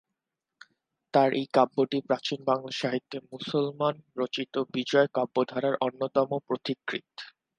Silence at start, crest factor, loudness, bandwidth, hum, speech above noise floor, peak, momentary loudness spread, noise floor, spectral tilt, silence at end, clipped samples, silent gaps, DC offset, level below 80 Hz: 1.15 s; 22 dB; -28 LUFS; 9.6 kHz; none; 58 dB; -8 dBFS; 10 LU; -86 dBFS; -5.5 dB/octave; 0.35 s; under 0.1%; none; under 0.1%; -78 dBFS